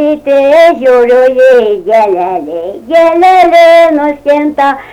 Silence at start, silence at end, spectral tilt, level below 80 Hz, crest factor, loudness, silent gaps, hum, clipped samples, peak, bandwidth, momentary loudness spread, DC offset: 0 s; 0 s; -4.5 dB/octave; -46 dBFS; 6 dB; -6 LUFS; none; none; 0.7%; 0 dBFS; 14 kHz; 8 LU; under 0.1%